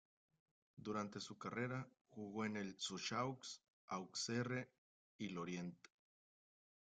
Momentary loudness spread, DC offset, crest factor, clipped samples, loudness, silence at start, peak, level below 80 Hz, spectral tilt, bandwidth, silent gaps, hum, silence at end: 12 LU; under 0.1%; 20 dB; under 0.1%; -47 LUFS; 0.75 s; -30 dBFS; -84 dBFS; -4 dB/octave; 9.6 kHz; 2.01-2.05 s, 3.68-3.88 s, 4.78-5.19 s; none; 1.25 s